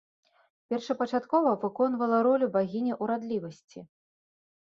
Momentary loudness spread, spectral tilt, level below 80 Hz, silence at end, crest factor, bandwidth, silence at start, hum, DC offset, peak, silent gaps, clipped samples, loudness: 10 LU; -7 dB/octave; -76 dBFS; 0.85 s; 18 dB; 7.4 kHz; 0.7 s; none; under 0.1%; -12 dBFS; 3.64-3.68 s; under 0.1%; -28 LUFS